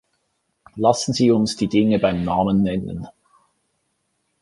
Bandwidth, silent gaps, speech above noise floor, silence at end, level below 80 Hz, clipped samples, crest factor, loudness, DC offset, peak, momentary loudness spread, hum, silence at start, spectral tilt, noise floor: 11.5 kHz; none; 53 dB; 1.3 s; -48 dBFS; under 0.1%; 18 dB; -19 LUFS; under 0.1%; -2 dBFS; 15 LU; none; 0.75 s; -6 dB/octave; -71 dBFS